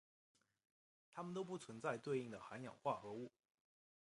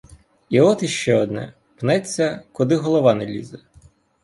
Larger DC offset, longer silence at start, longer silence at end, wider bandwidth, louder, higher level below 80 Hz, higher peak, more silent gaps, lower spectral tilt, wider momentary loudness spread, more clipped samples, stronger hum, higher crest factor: neither; first, 1.1 s vs 0.5 s; first, 0.85 s vs 0.65 s; about the same, 11 kHz vs 11.5 kHz; second, -48 LUFS vs -20 LUFS; second, -88 dBFS vs -56 dBFS; second, -28 dBFS vs -2 dBFS; neither; about the same, -6 dB/octave vs -5.5 dB/octave; second, 9 LU vs 14 LU; neither; neither; about the same, 22 dB vs 18 dB